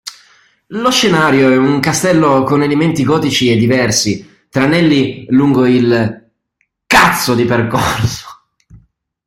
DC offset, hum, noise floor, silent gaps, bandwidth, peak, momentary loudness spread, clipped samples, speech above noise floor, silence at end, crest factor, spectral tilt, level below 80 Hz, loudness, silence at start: under 0.1%; none; -65 dBFS; none; 16.5 kHz; 0 dBFS; 8 LU; under 0.1%; 54 dB; 0.5 s; 12 dB; -4.5 dB/octave; -44 dBFS; -12 LUFS; 0.05 s